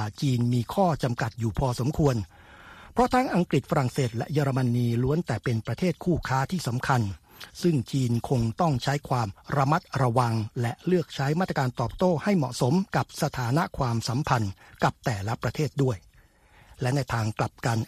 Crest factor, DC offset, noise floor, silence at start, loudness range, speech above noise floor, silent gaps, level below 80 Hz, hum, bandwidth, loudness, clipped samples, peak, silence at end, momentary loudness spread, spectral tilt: 20 dB; under 0.1%; -57 dBFS; 0 s; 2 LU; 32 dB; none; -48 dBFS; none; 14.5 kHz; -27 LUFS; under 0.1%; -6 dBFS; 0 s; 5 LU; -6.5 dB/octave